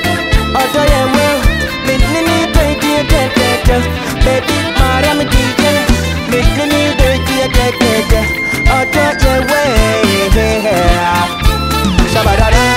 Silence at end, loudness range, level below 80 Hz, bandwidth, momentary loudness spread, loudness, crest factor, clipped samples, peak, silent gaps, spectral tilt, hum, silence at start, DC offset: 0 s; 1 LU; -16 dBFS; 16.5 kHz; 3 LU; -11 LUFS; 10 dB; under 0.1%; 0 dBFS; none; -4.5 dB/octave; none; 0 s; under 0.1%